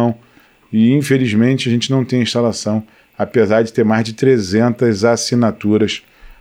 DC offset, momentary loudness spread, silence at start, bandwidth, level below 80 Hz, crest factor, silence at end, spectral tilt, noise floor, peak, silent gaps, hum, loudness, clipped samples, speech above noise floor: under 0.1%; 7 LU; 0 s; 15 kHz; -52 dBFS; 14 dB; 0.1 s; -6 dB/octave; -49 dBFS; 0 dBFS; none; none; -15 LUFS; under 0.1%; 35 dB